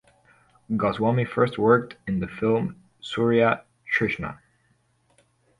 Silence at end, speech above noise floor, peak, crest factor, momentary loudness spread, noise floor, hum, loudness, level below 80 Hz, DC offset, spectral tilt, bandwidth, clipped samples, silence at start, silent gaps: 1.25 s; 43 dB; -6 dBFS; 20 dB; 12 LU; -66 dBFS; none; -24 LUFS; -56 dBFS; under 0.1%; -7.5 dB/octave; 11 kHz; under 0.1%; 0.7 s; none